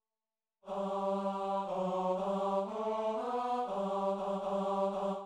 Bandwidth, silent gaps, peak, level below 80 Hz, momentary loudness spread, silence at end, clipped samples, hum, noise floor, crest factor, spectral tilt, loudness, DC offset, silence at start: 10 kHz; none; -22 dBFS; -72 dBFS; 2 LU; 0 s; under 0.1%; none; under -90 dBFS; 14 dB; -7 dB/octave; -35 LUFS; under 0.1%; 0.65 s